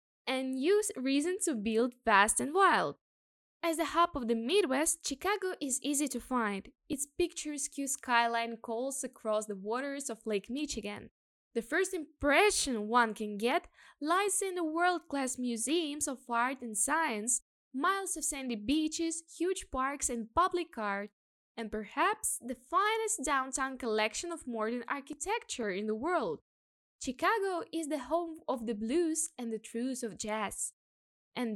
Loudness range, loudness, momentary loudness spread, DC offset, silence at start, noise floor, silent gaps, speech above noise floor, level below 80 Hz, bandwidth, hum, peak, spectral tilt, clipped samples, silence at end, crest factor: 5 LU; -33 LUFS; 10 LU; under 0.1%; 0.25 s; under -90 dBFS; 3.01-3.60 s, 11.11-11.51 s, 17.42-17.71 s, 21.13-21.55 s, 26.42-26.99 s, 30.73-31.32 s; over 57 dB; -62 dBFS; 17.5 kHz; none; -10 dBFS; -2 dB/octave; under 0.1%; 0 s; 24 dB